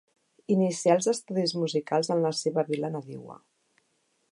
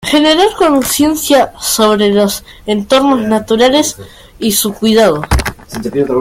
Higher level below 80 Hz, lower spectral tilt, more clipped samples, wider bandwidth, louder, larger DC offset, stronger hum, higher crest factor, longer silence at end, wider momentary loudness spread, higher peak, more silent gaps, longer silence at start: second, -80 dBFS vs -28 dBFS; about the same, -5 dB/octave vs -4 dB/octave; neither; second, 11.5 kHz vs 16.5 kHz; second, -27 LUFS vs -11 LUFS; neither; neither; first, 20 dB vs 12 dB; first, 0.95 s vs 0 s; first, 18 LU vs 9 LU; second, -8 dBFS vs 0 dBFS; neither; first, 0.5 s vs 0 s